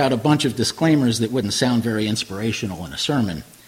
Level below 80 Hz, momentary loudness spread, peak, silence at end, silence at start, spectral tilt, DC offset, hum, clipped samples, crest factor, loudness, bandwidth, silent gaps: -50 dBFS; 7 LU; -4 dBFS; 0.25 s; 0 s; -5 dB/octave; under 0.1%; none; under 0.1%; 16 dB; -20 LUFS; 16.5 kHz; none